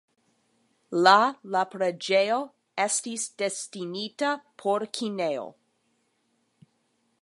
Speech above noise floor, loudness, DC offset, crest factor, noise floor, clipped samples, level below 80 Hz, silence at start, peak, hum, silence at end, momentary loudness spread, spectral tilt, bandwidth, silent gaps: 46 dB; -26 LUFS; under 0.1%; 24 dB; -72 dBFS; under 0.1%; -84 dBFS; 0.9 s; -4 dBFS; none; 1.7 s; 14 LU; -2.5 dB/octave; 11.5 kHz; none